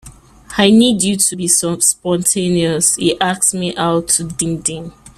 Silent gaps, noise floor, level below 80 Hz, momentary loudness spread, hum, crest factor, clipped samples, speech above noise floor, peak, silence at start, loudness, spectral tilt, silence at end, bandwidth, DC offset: none; -38 dBFS; -46 dBFS; 8 LU; none; 16 dB; under 0.1%; 23 dB; 0 dBFS; 0.05 s; -14 LUFS; -3 dB/octave; 0.1 s; 16 kHz; under 0.1%